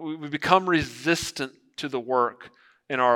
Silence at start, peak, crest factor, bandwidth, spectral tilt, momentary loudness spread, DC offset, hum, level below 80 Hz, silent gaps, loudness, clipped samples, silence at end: 0 s; -2 dBFS; 24 dB; 17 kHz; -4 dB/octave; 12 LU; under 0.1%; none; -58 dBFS; none; -25 LUFS; under 0.1%; 0 s